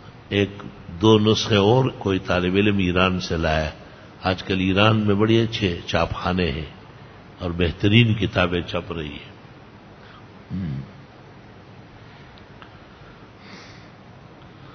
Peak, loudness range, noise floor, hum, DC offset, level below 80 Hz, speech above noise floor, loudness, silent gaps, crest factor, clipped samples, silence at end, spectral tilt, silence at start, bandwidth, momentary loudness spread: 0 dBFS; 18 LU; -45 dBFS; none; under 0.1%; -40 dBFS; 24 dB; -21 LUFS; none; 22 dB; under 0.1%; 0 s; -6.5 dB/octave; 0.05 s; 6.6 kHz; 21 LU